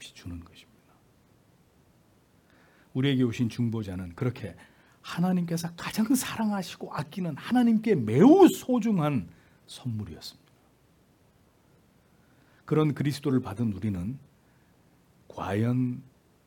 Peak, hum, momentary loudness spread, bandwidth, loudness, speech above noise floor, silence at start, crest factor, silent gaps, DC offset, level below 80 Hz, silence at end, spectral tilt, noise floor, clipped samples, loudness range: -6 dBFS; none; 21 LU; 18 kHz; -27 LUFS; 37 dB; 0 s; 22 dB; none; under 0.1%; -64 dBFS; 0.45 s; -6.5 dB/octave; -63 dBFS; under 0.1%; 11 LU